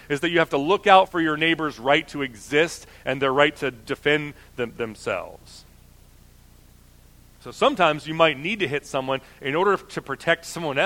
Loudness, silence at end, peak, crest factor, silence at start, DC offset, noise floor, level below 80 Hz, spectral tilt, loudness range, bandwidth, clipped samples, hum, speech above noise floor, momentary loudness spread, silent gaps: -22 LUFS; 0 s; 0 dBFS; 24 dB; 0.1 s; under 0.1%; -51 dBFS; -54 dBFS; -4.5 dB/octave; 9 LU; 17.5 kHz; under 0.1%; none; 28 dB; 11 LU; none